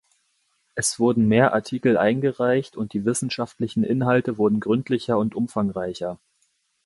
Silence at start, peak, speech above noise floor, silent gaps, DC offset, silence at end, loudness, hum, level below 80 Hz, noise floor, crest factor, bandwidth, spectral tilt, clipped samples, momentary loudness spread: 0.75 s; -4 dBFS; 47 dB; none; under 0.1%; 0.7 s; -22 LUFS; none; -58 dBFS; -69 dBFS; 18 dB; 11.5 kHz; -5.5 dB/octave; under 0.1%; 10 LU